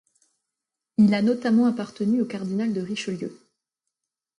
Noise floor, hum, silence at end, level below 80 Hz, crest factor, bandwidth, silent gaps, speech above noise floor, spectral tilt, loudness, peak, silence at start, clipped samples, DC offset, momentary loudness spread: -86 dBFS; none; 1.05 s; -70 dBFS; 16 dB; 10.5 kHz; none; 63 dB; -7 dB/octave; -24 LUFS; -10 dBFS; 1 s; under 0.1%; under 0.1%; 11 LU